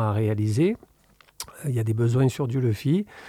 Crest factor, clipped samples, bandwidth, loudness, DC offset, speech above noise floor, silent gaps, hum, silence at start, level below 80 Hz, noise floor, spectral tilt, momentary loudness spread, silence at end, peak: 14 dB; under 0.1%; 15 kHz; -24 LUFS; under 0.1%; 35 dB; none; none; 0 s; -58 dBFS; -58 dBFS; -7.5 dB/octave; 12 LU; 0 s; -10 dBFS